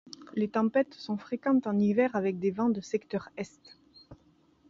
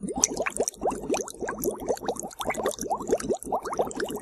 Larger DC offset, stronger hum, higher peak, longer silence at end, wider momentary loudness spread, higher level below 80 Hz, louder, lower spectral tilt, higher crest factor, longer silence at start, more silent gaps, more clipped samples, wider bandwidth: neither; neither; second, -14 dBFS vs 0 dBFS; first, 0.55 s vs 0 s; first, 12 LU vs 6 LU; second, -70 dBFS vs -52 dBFS; about the same, -30 LUFS vs -29 LUFS; first, -7 dB/octave vs -2.5 dB/octave; second, 18 dB vs 28 dB; first, 0.2 s vs 0 s; neither; neither; second, 7.6 kHz vs 15 kHz